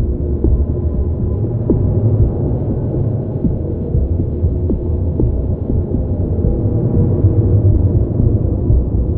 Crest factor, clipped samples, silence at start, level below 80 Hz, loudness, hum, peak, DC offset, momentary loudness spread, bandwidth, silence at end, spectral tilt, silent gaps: 14 dB; under 0.1%; 0 s; -20 dBFS; -16 LUFS; none; 0 dBFS; under 0.1%; 5 LU; 1.8 kHz; 0 s; -14.5 dB/octave; none